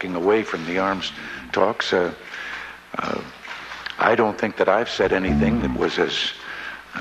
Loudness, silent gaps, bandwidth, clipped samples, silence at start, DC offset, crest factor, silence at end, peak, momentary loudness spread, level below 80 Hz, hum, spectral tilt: -22 LUFS; none; 13.5 kHz; under 0.1%; 0 s; under 0.1%; 20 dB; 0 s; -4 dBFS; 13 LU; -42 dBFS; none; -5 dB/octave